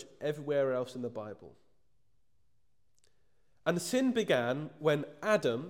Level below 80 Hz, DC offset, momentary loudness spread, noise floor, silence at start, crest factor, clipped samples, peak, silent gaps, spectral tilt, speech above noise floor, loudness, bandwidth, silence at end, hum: -78 dBFS; under 0.1%; 11 LU; -79 dBFS; 0 s; 18 dB; under 0.1%; -16 dBFS; none; -5 dB/octave; 47 dB; -32 LUFS; 16.5 kHz; 0 s; none